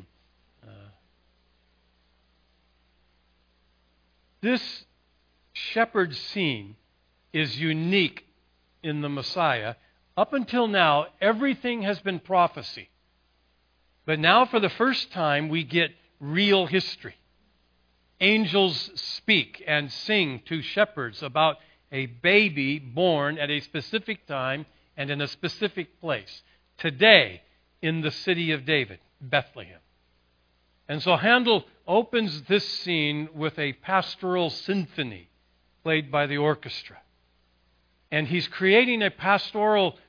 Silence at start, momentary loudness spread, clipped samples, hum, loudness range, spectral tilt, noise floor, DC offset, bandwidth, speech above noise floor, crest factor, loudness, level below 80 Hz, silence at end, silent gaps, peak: 0 s; 16 LU; under 0.1%; none; 6 LU; -6 dB/octave; -67 dBFS; under 0.1%; 5.4 kHz; 42 dB; 26 dB; -24 LUFS; -68 dBFS; 0.15 s; none; 0 dBFS